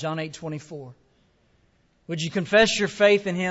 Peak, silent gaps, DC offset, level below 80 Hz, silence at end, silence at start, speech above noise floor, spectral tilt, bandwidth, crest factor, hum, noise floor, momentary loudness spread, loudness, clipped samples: -6 dBFS; none; under 0.1%; -58 dBFS; 0 s; 0 s; 41 dB; -4 dB/octave; 8 kHz; 18 dB; none; -64 dBFS; 17 LU; -22 LUFS; under 0.1%